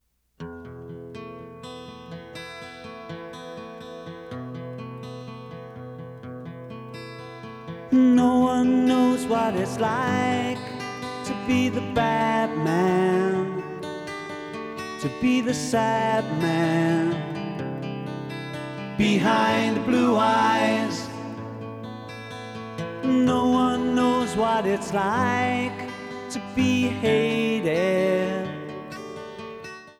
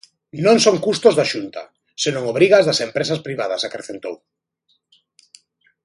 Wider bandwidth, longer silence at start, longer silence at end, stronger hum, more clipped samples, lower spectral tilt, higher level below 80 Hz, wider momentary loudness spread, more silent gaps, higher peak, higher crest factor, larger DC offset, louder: first, 13.5 kHz vs 11.5 kHz; about the same, 0.4 s vs 0.35 s; second, 0.05 s vs 1.7 s; neither; neither; first, -5.5 dB/octave vs -4 dB/octave; first, -58 dBFS vs -64 dBFS; about the same, 19 LU vs 19 LU; neither; second, -8 dBFS vs 0 dBFS; about the same, 16 dB vs 20 dB; neither; second, -23 LUFS vs -17 LUFS